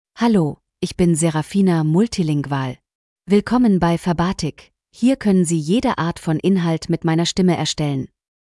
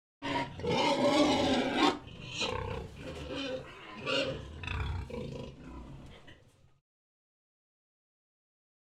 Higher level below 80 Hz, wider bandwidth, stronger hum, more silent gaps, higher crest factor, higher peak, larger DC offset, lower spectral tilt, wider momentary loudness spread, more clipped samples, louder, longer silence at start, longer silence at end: about the same, -46 dBFS vs -50 dBFS; second, 12 kHz vs 13.5 kHz; neither; first, 2.95-3.16 s vs none; second, 14 dB vs 22 dB; first, -4 dBFS vs -14 dBFS; neither; first, -6 dB/octave vs -4.5 dB/octave; second, 9 LU vs 19 LU; neither; first, -19 LUFS vs -32 LUFS; about the same, 0.15 s vs 0.2 s; second, 0.4 s vs 2.6 s